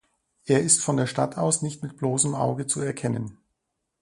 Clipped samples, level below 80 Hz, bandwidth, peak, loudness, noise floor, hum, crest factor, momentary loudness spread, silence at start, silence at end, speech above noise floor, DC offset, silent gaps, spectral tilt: under 0.1%; -62 dBFS; 11.5 kHz; -4 dBFS; -24 LUFS; -79 dBFS; none; 22 dB; 12 LU; 0.45 s; 0.7 s; 55 dB; under 0.1%; none; -4.5 dB/octave